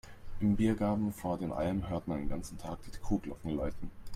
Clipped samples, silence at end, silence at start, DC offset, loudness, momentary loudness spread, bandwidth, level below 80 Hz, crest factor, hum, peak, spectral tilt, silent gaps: under 0.1%; 0 s; 0.05 s; under 0.1%; -35 LUFS; 14 LU; 15 kHz; -46 dBFS; 16 dB; none; -18 dBFS; -7.5 dB/octave; none